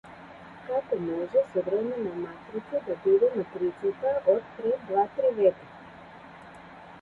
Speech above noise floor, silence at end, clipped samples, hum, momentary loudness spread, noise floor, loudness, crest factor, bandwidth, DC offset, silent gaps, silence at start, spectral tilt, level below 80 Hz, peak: 21 dB; 0 s; under 0.1%; none; 23 LU; -47 dBFS; -27 LUFS; 18 dB; 4.5 kHz; under 0.1%; none; 0.05 s; -8.5 dB/octave; -66 dBFS; -10 dBFS